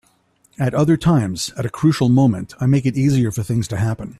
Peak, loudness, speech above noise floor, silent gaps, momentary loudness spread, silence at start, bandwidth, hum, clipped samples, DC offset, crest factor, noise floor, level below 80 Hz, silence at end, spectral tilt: -4 dBFS; -18 LUFS; 42 dB; none; 8 LU; 0.6 s; 13.5 kHz; none; under 0.1%; under 0.1%; 14 dB; -59 dBFS; -46 dBFS; 0.1 s; -7 dB/octave